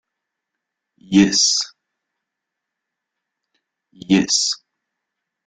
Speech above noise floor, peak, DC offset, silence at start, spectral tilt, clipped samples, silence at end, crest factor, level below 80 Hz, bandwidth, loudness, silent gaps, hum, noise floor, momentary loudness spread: 65 dB; -2 dBFS; under 0.1%; 1.1 s; -3 dB/octave; under 0.1%; 0.9 s; 22 dB; -58 dBFS; 9.6 kHz; -16 LUFS; none; none; -82 dBFS; 11 LU